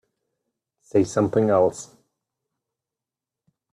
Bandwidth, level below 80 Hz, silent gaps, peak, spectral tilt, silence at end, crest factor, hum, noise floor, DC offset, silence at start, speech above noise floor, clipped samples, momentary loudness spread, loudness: 12 kHz; -64 dBFS; none; -6 dBFS; -7 dB/octave; 1.9 s; 20 dB; none; -88 dBFS; under 0.1%; 0.95 s; 68 dB; under 0.1%; 5 LU; -21 LUFS